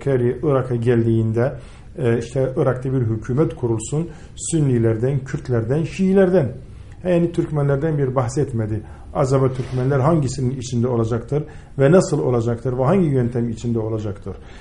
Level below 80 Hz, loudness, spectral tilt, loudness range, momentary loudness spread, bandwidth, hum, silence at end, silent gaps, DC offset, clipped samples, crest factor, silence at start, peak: -40 dBFS; -20 LUFS; -7.5 dB/octave; 2 LU; 10 LU; 10.5 kHz; none; 0 s; none; 0.4%; under 0.1%; 18 dB; 0 s; -2 dBFS